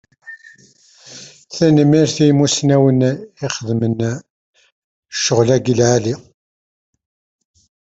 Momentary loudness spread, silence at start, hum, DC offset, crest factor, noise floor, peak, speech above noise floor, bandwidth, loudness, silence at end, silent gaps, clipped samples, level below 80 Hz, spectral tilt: 23 LU; 0.25 s; none; under 0.1%; 16 dB; -49 dBFS; 0 dBFS; 35 dB; 8 kHz; -15 LUFS; 1.75 s; 4.30-4.53 s, 4.72-5.03 s; under 0.1%; -54 dBFS; -5.5 dB/octave